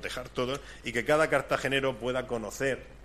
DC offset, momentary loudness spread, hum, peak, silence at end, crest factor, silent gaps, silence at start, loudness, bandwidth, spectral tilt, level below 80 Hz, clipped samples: under 0.1%; 9 LU; none; -10 dBFS; 0 s; 20 dB; none; 0 s; -30 LUFS; 15.5 kHz; -4.5 dB/octave; -52 dBFS; under 0.1%